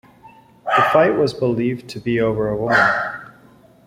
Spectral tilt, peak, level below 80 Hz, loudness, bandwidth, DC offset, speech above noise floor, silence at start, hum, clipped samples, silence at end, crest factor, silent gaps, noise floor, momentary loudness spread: -6.5 dB/octave; -2 dBFS; -50 dBFS; -18 LUFS; 16 kHz; under 0.1%; 31 dB; 0.25 s; none; under 0.1%; 0.55 s; 18 dB; none; -49 dBFS; 12 LU